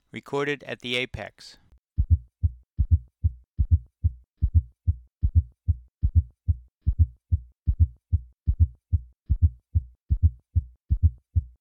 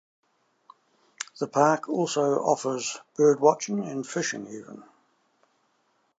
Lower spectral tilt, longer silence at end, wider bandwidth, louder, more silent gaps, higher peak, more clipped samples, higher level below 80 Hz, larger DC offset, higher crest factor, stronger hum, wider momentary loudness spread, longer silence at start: first, -7.5 dB/octave vs -4.5 dB/octave; second, 0.15 s vs 1.35 s; second, 6 kHz vs 9 kHz; second, -28 LUFS vs -25 LUFS; first, 1.78-1.84 s vs none; second, -8 dBFS vs -4 dBFS; neither; first, -28 dBFS vs -82 dBFS; neither; about the same, 18 dB vs 22 dB; neither; second, 6 LU vs 17 LU; second, 0.15 s vs 1.2 s